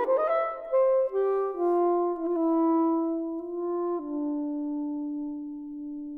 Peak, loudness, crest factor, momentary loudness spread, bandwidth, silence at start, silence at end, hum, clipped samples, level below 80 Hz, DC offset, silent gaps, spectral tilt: -16 dBFS; -28 LUFS; 12 dB; 11 LU; 3.5 kHz; 0 s; 0 s; none; under 0.1%; -66 dBFS; under 0.1%; none; -8 dB/octave